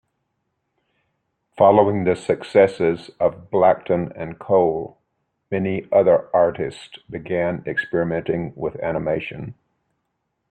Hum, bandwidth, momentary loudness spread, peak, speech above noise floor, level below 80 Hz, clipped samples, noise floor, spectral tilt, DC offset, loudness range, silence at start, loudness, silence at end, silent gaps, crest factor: none; 9.2 kHz; 14 LU; -2 dBFS; 55 dB; -56 dBFS; under 0.1%; -75 dBFS; -7.5 dB/octave; under 0.1%; 6 LU; 1.55 s; -20 LUFS; 1 s; none; 20 dB